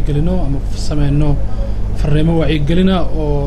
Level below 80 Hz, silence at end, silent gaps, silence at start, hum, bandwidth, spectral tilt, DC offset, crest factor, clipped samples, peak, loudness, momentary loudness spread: -18 dBFS; 0 s; none; 0 s; none; 10 kHz; -7.5 dB/octave; under 0.1%; 10 dB; under 0.1%; -2 dBFS; -16 LUFS; 8 LU